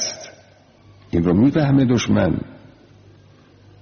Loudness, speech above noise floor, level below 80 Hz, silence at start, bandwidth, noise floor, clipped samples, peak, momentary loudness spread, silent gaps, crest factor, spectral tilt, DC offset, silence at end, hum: -18 LUFS; 34 dB; -44 dBFS; 0 s; 6.8 kHz; -50 dBFS; under 0.1%; -6 dBFS; 20 LU; none; 14 dB; -6.5 dB/octave; under 0.1%; 1.25 s; none